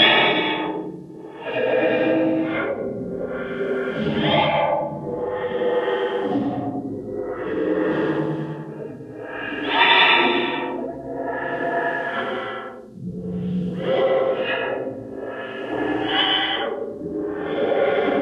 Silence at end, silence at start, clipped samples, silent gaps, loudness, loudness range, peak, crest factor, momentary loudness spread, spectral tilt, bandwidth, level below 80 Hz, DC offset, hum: 0 s; 0 s; under 0.1%; none; -22 LUFS; 6 LU; -2 dBFS; 20 dB; 13 LU; -6.5 dB/octave; 7.2 kHz; -56 dBFS; under 0.1%; none